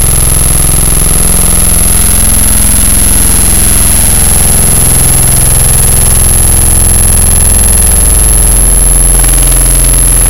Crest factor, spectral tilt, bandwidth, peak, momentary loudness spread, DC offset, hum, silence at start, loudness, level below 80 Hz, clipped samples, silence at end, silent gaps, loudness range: 6 dB; -3 dB/octave; over 20 kHz; 0 dBFS; 1 LU; 10%; none; 0 s; -4 LUFS; -8 dBFS; 10%; 0 s; none; 1 LU